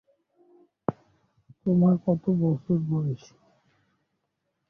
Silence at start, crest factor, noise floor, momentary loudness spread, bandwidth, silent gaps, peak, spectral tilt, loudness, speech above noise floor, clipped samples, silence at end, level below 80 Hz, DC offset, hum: 0.9 s; 20 dB; -79 dBFS; 12 LU; 6.4 kHz; none; -8 dBFS; -11 dB/octave; -26 LUFS; 55 dB; under 0.1%; 1.55 s; -62 dBFS; under 0.1%; none